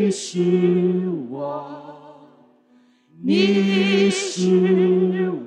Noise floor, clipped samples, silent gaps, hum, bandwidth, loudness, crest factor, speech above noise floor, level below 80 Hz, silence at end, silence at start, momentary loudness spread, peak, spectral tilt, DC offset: -56 dBFS; under 0.1%; none; none; 10 kHz; -19 LUFS; 16 dB; 37 dB; -68 dBFS; 0 s; 0 s; 12 LU; -4 dBFS; -6 dB/octave; under 0.1%